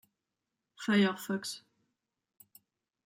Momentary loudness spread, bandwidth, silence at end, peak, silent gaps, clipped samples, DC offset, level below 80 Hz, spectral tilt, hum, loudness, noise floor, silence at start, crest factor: 14 LU; 16 kHz; 1.5 s; -16 dBFS; none; under 0.1%; under 0.1%; -82 dBFS; -5 dB/octave; none; -32 LUFS; -88 dBFS; 0.8 s; 20 dB